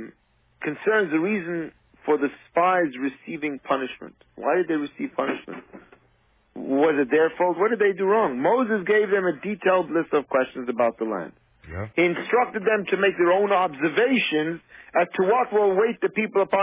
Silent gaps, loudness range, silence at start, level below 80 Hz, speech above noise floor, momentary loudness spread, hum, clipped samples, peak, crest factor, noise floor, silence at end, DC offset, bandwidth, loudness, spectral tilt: none; 5 LU; 0 s; -60 dBFS; 40 dB; 12 LU; none; under 0.1%; -8 dBFS; 14 dB; -63 dBFS; 0 s; under 0.1%; 3.8 kHz; -23 LUFS; -9.5 dB/octave